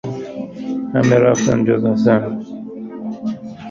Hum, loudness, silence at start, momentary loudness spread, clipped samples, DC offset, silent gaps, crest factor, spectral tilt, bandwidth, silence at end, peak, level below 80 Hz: none; -17 LUFS; 0.05 s; 17 LU; under 0.1%; under 0.1%; none; 16 dB; -6.5 dB/octave; 7.4 kHz; 0 s; -2 dBFS; -52 dBFS